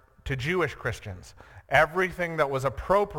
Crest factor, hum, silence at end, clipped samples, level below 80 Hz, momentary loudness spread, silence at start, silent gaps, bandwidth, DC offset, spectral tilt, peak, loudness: 20 dB; none; 0 s; under 0.1%; -46 dBFS; 14 LU; 0.25 s; none; 17.5 kHz; under 0.1%; -5.5 dB/octave; -8 dBFS; -26 LUFS